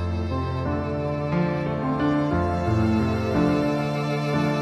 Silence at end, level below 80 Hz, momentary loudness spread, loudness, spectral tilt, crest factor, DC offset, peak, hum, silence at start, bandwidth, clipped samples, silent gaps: 0 s; -40 dBFS; 5 LU; -24 LUFS; -8 dB/octave; 14 dB; under 0.1%; -8 dBFS; none; 0 s; 13.5 kHz; under 0.1%; none